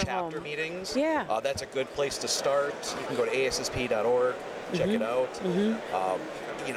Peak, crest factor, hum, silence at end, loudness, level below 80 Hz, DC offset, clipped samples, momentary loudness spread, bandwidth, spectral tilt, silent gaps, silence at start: -16 dBFS; 12 dB; none; 0 s; -29 LUFS; -58 dBFS; under 0.1%; under 0.1%; 7 LU; 15.5 kHz; -4 dB/octave; none; 0 s